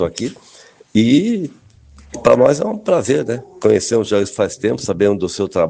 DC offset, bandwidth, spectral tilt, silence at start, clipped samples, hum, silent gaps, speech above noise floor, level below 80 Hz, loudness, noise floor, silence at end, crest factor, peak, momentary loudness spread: under 0.1%; 9.8 kHz; -5.5 dB/octave; 0 s; under 0.1%; none; none; 30 dB; -50 dBFS; -16 LUFS; -45 dBFS; 0 s; 16 dB; 0 dBFS; 11 LU